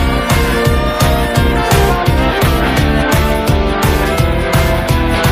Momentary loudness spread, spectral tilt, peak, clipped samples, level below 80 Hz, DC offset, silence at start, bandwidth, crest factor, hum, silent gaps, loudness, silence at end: 2 LU; -5.5 dB/octave; 0 dBFS; under 0.1%; -18 dBFS; under 0.1%; 0 s; 16 kHz; 12 dB; none; none; -13 LUFS; 0 s